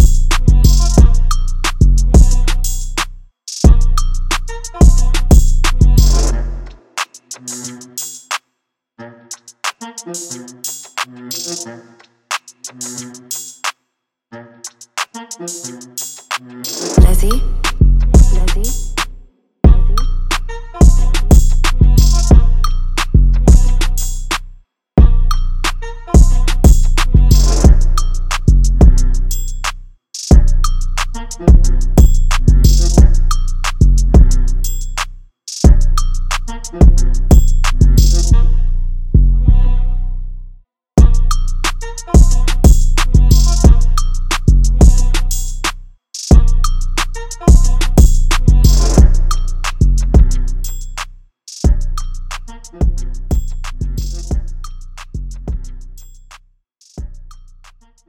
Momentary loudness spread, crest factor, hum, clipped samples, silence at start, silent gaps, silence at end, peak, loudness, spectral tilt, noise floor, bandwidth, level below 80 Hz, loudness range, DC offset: 16 LU; 10 dB; none; 1%; 0 s; none; 0.75 s; 0 dBFS; -14 LUFS; -5 dB/octave; -73 dBFS; 18.5 kHz; -12 dBFS; 12 LU; under 0.1%